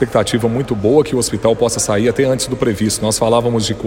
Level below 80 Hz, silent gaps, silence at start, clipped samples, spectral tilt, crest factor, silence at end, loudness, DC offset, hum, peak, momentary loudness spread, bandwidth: -40 dBFS; none; 0 s; under 0.1%; -4.5 dB/octave; 14 dB; 0 s; -15 LUFS; under 0.1%; none; 0 dBFS; 3 LU; 16.5 kHz